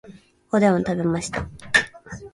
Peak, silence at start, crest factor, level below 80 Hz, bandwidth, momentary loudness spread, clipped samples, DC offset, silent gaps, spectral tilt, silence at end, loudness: -2 dBFS; 0.05 s; 22 dB; -48 dBFS; 11.5 kHz; 13 LU; under 0.1%; under 0.1%; none; -5 dB/octave; 0.05 s; -22 LUFS